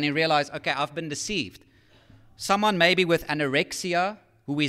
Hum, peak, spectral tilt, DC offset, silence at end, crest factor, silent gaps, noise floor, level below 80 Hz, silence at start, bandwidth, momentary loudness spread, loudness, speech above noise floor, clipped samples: none; -6 dBFS; -4 dB/octave; under 0.1%; 0 s; 20 dB; none; -55 dBFS; -58 dBFS; 0 s; 16 kHz; 12 LU; -24 LUFS; 30 dB; under 0.1%